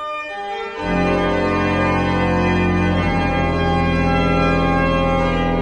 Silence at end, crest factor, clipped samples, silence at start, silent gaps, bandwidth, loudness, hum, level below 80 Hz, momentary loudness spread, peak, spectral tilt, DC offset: 0 s; 12 dB; under 0.1%; 0 s; none; 9.6 kHz; -18 LUFS; none; -28 dBFS; 7 LU; -6 dBFS; -7 dB/octave; under 0.1%